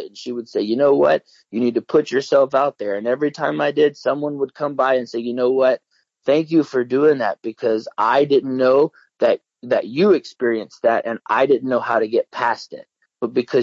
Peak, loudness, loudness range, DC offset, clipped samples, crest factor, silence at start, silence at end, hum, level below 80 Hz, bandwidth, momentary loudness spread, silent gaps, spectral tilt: -4 dBFS; -19 LUFS; 2 LU; under 0.1%; under 0.1%; 14 dB; 0 s; 0 s; none; -70 dBFS; 7.6 kHz; 8 LU; none; -6 dB/octave